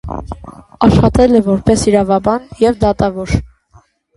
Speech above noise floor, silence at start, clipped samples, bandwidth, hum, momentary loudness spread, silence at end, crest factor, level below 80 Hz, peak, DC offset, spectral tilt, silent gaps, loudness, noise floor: 37 dB; 0.05 s; under 0.1%; 11.5 kHz; none; 15 LU; 0.7 s; 14 dB; -28 dBFS; 0 dBFS; under 0.1%; -7 dB/octave; none; -13 LUFS; -48 dBFS